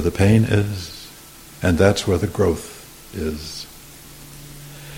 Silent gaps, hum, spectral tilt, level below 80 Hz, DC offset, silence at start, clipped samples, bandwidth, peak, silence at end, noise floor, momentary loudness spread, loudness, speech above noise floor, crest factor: none; none; -6 dB/octave; -38 dBFS; under 0.1%; 0 s; under 0.1%; 17 kHz; -2 dBFS; 0 s; -42 dBFS; 23 LU; -20 LUFS; 24 dB; 20 dB